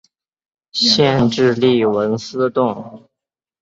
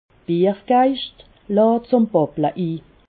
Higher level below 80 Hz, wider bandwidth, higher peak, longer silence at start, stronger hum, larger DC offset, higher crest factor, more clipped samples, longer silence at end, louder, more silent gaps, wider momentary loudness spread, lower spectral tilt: about the same, -52 dBFS vs -56 dBFS; first, 7.8 kHz vs 4.7 kHz; first, 0 dBFS vs -4 dBFS; first, 0.75 s vs 0.3 s; neither; neither; about the same, 18 dB vs 16 dB; neither; first, 0.65 s vs 0.3 s; first, -16 LUFS vs -19 LUFS; neither; about the same, 8 LU vs 10 LU; second, -5 dB/octave vs -12 dB/octave